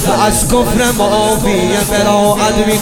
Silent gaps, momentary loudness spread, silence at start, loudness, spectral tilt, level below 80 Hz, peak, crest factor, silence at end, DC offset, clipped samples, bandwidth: none; 2 LU; 0 s; -11 LUFS; -4 dB/octave; -26 dBFS; 0 dBFS; 12 dB; 0 s; under 0.1%; under 0.1%; 17.5 kHz